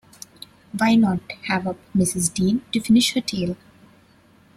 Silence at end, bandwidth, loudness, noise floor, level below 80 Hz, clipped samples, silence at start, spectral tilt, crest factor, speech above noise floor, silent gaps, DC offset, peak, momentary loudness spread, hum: 1 s; 13.5 kHz; -21 LUFS; -54 dBFS; -54 dBFS; under 0.1%; 0.75 s; -4.5 dB/octave; 18 dB; 34 dB; none; under 0.1%; -4 dBFS; 18 LU; none